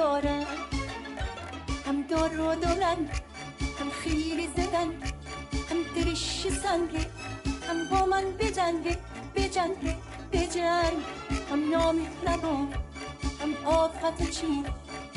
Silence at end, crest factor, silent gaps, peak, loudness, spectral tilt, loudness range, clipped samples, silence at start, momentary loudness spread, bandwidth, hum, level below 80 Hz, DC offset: 0 s; 16 dB; none; -12 dBFS; -30 LUFS; -5 dB/octave; 2 LU; under 0.1%; 0 s; 10 LU; 11.5 kHz; none; -40 dBFS; under 0.1%